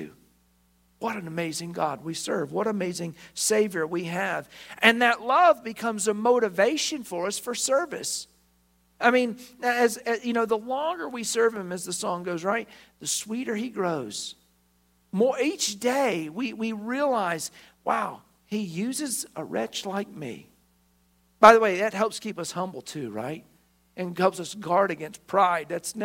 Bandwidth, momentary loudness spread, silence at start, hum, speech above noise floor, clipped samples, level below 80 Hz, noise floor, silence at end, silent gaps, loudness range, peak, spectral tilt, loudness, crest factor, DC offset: 16.5 kHz; 14 LU; 0 s; none; 40 dB; under 0.1%; -68 dBFS; -66 dBFS; 0 s; none; 7 LU; 0 dBFS; -3.5 dB/octave; -26 LUFS; 26 dB; under 0.1%